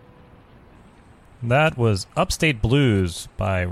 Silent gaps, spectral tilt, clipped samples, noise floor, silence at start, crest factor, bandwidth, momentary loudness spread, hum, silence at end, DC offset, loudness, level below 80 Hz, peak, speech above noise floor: none; -5.5 dB/octave; under 0.1%; -49 dBFS; 1.4 s; 16 dB; 15.5 kHz; 8 LU; none; 0 s; under 0.1%; -21 LUFS; -38 dBFS; -6 dBFS; 29 dB